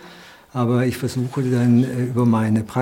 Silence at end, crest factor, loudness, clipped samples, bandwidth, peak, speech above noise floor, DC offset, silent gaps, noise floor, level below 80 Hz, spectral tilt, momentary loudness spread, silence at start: 0 s; 14 dB; -20 LUFS; under 0.1%; 16.5 kHz; -6 dBFS; 25 dB; under 0.1%; none; -43 dBFS; -58 dBFS; -7.5 dB/octave; 7 LU; 0.05 s